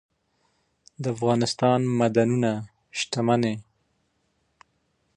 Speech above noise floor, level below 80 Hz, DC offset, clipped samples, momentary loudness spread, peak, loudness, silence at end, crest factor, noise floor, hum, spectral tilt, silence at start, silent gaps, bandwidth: 48 dB; -66 dBFS; under 0.1%; under 0.1%; 11 LU; -6 dBFS; -24 LUFS; 1.55 s; 20 dB; -71 dBFS; none; -6 dB/octave; 1 s; none; 10.5 kHz